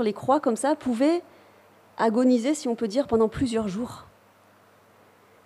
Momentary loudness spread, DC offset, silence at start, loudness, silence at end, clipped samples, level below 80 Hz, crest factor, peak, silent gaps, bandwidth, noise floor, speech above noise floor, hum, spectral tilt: 11 LU; under 0.1%; 0 s; -24 LUFS; 1.45 s; under 0.1%; -56 dBFS; 16 dB; -10 dBFS; none; 13 kHz; -57 dBFS; 33 dB; none; -5.5 dB/octave